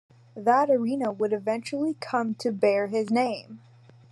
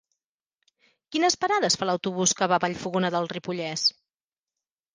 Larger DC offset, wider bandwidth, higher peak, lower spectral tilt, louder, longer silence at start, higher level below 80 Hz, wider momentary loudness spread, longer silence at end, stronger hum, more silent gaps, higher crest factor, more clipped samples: neither; first, 12 kHz vs 10.5 kHz; about the same, -8 dBFS vs -6 dBFS; first, -6 dB/octave vs -3 dB/octave; about the same, -26 LUFS vs -25 LUFS; second, 0.35 s vs 1.1 s; second, -82 dBFS vs -68 dBFS; about the same, 7 LU vs 8 LU; second, 0.55 s vs 1.05 s; neither; neither; about the same, 18 dB vs 22 dB; neither